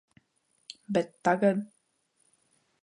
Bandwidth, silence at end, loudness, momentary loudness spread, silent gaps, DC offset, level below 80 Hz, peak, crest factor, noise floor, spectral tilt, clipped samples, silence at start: 10.5 kHz; 1.2 s; -28 LUFS; 22 LU; none; under 0.1%; -78 dBFS; -12 dBFS; 20 dB; -73 dBFS; -6.5 dB/octave; under 0.1%; 0.9 s